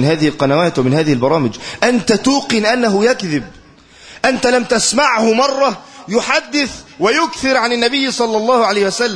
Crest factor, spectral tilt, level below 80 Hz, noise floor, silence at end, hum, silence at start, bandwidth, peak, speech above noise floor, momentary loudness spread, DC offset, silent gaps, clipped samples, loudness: 14 dB; -4 dB/octave; -48 dBFS; -42 dBFS; 0 s; none; 0 s; 10.5 kHz; 0 dBFS; 28 dB; 6 LU; under 0.1%; none; under 0.1%; -14 LUFS